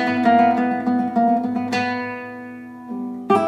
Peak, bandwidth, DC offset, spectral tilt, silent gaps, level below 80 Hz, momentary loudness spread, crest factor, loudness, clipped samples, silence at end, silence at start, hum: -4 dBFS; 10 kHz; under 0.1%; -6.5 dB/octave; none; -66 dBFS; 18 LU; 16 dB; -20 LUFS; under 0.1%; 0 s; 0 s; none